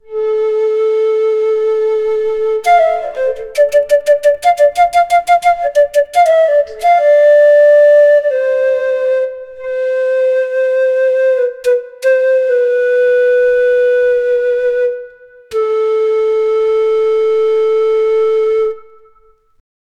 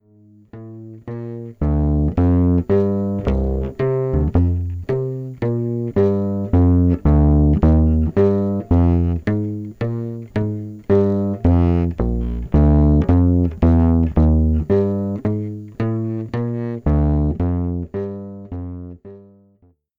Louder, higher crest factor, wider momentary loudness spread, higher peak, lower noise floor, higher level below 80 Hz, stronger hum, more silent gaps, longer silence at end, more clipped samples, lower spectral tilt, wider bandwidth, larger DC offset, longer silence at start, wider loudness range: first, -12 LUFS vs -18 LUFS; about the same, 12 dB vs 14 dB; second, 8 LU vs 15 LU; about the same, 0 dBFS vs -2 dBFS; second, -49 dBFS vs -56 dBFS; second, -52 dBFS vs -24 dBFS; neither; neither; first, 1.15 s vs 0.8 s; neither; second, -1.5 dB/octave vs -11.5 dB/octave; first, 13 kHz vs 4.3 kHz; neither; second, 0.1 s vs 0.55 s; about the same, 5 LU vs 6 LU